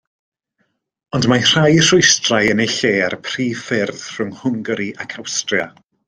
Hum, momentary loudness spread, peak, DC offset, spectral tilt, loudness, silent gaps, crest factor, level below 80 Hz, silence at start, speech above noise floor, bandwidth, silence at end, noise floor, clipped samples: none; 14 LU; 0 dBFS; under 0.1%; -3.5 dB/octave; -16 LUFS; none; 18 dB; -52 dBFS; 1.15 s; 52 dB; 10.5 kHz; 0.4 s; -68 dBFS; under 0.1%